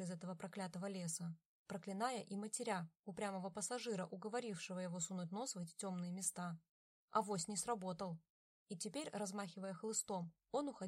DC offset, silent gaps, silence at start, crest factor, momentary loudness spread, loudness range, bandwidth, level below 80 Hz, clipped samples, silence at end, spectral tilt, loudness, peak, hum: under 0.1%; 1.45-1.66 s, 2.99-3.03 s, 6.69-7.08 s, 8.30-8.66 s; 0 s; 22 dB; 7 LU; 1 LU; 16 kHz; -86 dBFS; under 0.1%; 0 s; -4 dB/octave; -45 LUFS; -24 dBFS; none